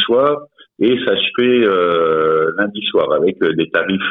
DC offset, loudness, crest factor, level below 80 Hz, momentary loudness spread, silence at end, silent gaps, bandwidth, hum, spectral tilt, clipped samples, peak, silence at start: under 0.1%; -15 LUFS; 12 dB; -58 dBFS; 4 LU; 0 s; none; 4.1 kHz; none; -8 dB/octave; under 0.1%; -4 dBFS; 0 s